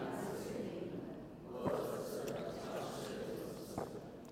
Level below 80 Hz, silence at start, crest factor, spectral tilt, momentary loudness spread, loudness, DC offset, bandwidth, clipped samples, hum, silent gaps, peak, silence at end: -68 dBFS; 0 s; 18 dB; -5.5 dB/octave; 7 LU; -44 LUFS; under 0.1%; 16 kHz; under 0.1%; none; none; -24 dBFS; 0 s